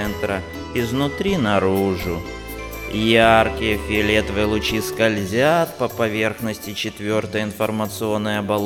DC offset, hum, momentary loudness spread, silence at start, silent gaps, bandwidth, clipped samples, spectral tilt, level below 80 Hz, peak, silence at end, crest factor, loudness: under 0.1%; none; 10 LU; 0 s; none; over 20 kHz; under 0.1%; -5 dB/octave; -38 dBFS; -2 dBFS; 0 s; 20 dB; -20 LUFS